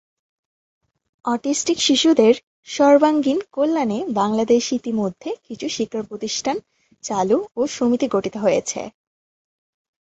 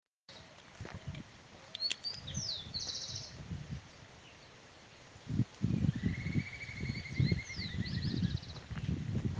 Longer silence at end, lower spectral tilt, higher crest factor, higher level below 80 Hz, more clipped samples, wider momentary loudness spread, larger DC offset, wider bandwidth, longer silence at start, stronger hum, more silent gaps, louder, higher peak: first, 1.2 s vs 0 s; about the same, -4 dB/octave vs -5 dB/octave; about the same, 18 dB vs 20 dB; second, -62 dBFS vs -54 dBFS; neither; second, 14 LU vs 21 LU; neither; second, 8.2 kHz vs 9.6 kHz; first, 1.25 s vs 0.3 s; neither; first, 2.43-2.63 s vs none; first, -20 LUFS vs -38 LUFS; first, -2 dBFS vs -18 dBFS